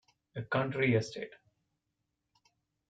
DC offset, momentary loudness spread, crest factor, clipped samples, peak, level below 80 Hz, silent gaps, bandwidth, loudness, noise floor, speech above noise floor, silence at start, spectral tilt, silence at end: under 0.1%; 17 LU; 20 dB; under 0.1%; -16 dBFS; -72 dBFS; none; 9 kHz; -32 LUFS; -84 dBFS; 52 dB; 0.35 s; -6.5 dB/octave; 1.6 s